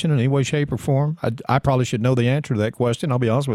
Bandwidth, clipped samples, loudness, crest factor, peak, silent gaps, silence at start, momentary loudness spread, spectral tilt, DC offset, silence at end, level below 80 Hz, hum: 13 kHz; under 0.1%; -21 LUFS; 16 dB; -4 dBFS; none; 0 s; 4 LU; -7 dB/octave; under 0.1%; 0 s; -48 dBFS; none